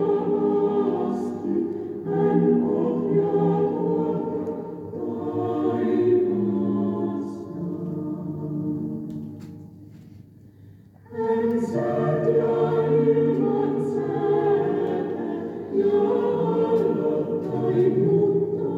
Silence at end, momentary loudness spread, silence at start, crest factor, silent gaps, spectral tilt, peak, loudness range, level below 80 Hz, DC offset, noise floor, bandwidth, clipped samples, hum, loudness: 0 s; 11 LU; 0 s; 14 dB; none; -10 dB/octave; -8 dBFS; 9 LU; -64 dBFS; under 0.1%; -48 dBFS; 7.4 kHz; under 0.1%; none; -23 LUFS